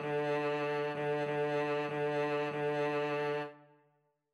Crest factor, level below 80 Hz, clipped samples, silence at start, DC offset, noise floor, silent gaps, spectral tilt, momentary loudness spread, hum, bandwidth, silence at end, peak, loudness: 10 dB; -82 dBFS; under 0.1%; 0 s; under 0.1%; -75 dBFS; none; -6.5 dB/octave; 2 LU; none; 11 kHz; 0.75 s; -24 dBFS; -34 LUFS